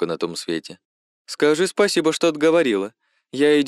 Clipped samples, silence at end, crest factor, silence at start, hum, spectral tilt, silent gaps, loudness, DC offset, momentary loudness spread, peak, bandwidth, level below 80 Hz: under 0.1%; 0 s; 16 dB; 0 s; none; -4 dB/octave; 0.85-1.25 s; -20 LUFS; under 0.1%; 15 LU; -6 dBFS; 13 kHz; -72 dBFS